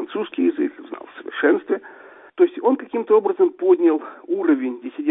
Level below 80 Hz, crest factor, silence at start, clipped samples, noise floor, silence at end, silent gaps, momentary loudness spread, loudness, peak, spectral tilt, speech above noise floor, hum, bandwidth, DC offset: -74 dBFS; 16 dB; 0 s; under 0.1%; -44 dBFS; 0 s; none; 13 LU; -20 LUFS; -4 dBFS; -10 dB/octave; 25 dB; none; 3.9 kHz; under 0.1%